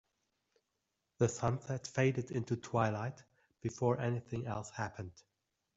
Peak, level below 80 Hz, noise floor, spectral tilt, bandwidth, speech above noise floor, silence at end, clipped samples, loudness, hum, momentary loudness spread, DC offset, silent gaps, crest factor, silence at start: -18 dBFS; -68 dBFS; -86 dBFS; -6.5 dB/octave; 8 kHz; 50 dB; 0.55 s; under 0.1%; -37 LUFS; none; 10 LU; under 0.1%; none; 20 dB; 1.2 s